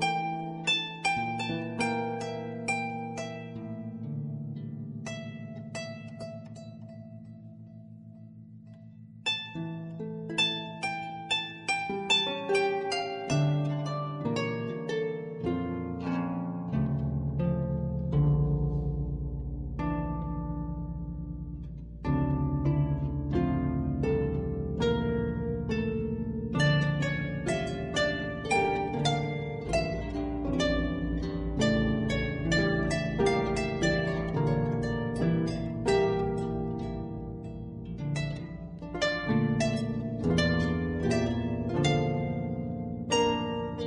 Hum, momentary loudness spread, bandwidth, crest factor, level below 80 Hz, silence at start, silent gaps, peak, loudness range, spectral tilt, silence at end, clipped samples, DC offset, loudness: none; 13 LU; 11 kHz; 16 dB; -42 dBFS; 0 s; none; -14 dBFS; 10 LU; -6 dB/octave; 0 s; under 0.1%; under 0.1%; -30 LUFS